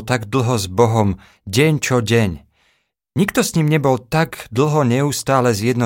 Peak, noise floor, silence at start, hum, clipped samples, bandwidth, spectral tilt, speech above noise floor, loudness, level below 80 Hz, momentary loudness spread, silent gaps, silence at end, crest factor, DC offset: -2 dBFS; -64 dBFS; 0 s; none; under 0.1%; 17 kHz; -5.5 dB/octave; 48 dB; -17 LUFS; -46 dBFS; 6 LU; none; 0 s; 16 dB; under 0.1%